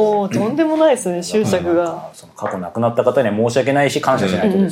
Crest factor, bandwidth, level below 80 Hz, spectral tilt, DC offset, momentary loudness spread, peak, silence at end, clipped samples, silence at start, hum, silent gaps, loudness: 14 dB; 16 kHz; -60 dBFS; -5.5 dB/octave; under 0.1%; 10 LU; -2 dBFS; 0 s; under 0.1%; 0 s; none; none; -17 LUFS